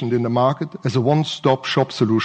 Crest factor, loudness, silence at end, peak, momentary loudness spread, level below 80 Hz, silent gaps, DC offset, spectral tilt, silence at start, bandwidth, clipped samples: 14 dB; -19 LUFS; 0 s; -4 dBFS; 3 LU; -60 dBFS; none; under 0.1%; -6.5 dB/octave; 0 s; 8.8 kHz; under 0.1%